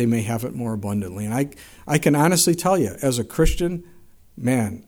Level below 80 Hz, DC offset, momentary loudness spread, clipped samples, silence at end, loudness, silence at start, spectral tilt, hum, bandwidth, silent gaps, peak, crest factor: -34 dBFS; under 0.1%; 10 LU; under 0.1%; 0.05 s; -22 LUFS; 0 s; -5 dB/octave; none; over 20 kHz; none; -4 dBFS; 18 dB